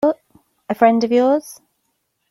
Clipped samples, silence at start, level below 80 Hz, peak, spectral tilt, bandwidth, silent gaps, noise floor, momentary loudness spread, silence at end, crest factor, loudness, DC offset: under 0.1%; 0 s; -66 dBFS; -2 dBFS; -5.5 dB/octave; 13.5 kHz; none; -70 dBFS; 16 LU; 0.75 s; 18 dB; -17 LUFS; under 0.1%